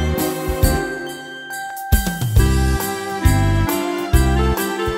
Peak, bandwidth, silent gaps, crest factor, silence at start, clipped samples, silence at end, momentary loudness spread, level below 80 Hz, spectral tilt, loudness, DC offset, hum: -2 dBFS; 16.5 kHz; none; 16 dB; 0 s; under 0.1%; 0 s; 11 LU; -22 dBFS; -5.5 dB/octave; -19 LUFS; under 0.1%; none